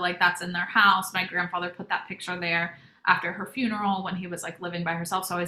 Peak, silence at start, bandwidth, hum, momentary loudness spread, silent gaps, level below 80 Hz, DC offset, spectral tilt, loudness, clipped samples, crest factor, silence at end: -6 dBFS; 0 s; 16 kHz; none; 13 LU; none; -68 dBFS; under 0.1%; -3.5 dB/octave; -26 LUFS; under 0.1%; 22 dB; 0 s